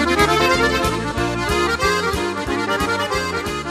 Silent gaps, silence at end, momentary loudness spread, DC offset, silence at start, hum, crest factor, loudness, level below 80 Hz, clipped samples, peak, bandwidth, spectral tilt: none; 0 s; 7 LU; under 0.1%; 0 s; none; 18 dB; -19 LUFS; -34 dBFS; under 0.1%; -2 dBFS; 14 kHz; -4 dB/octave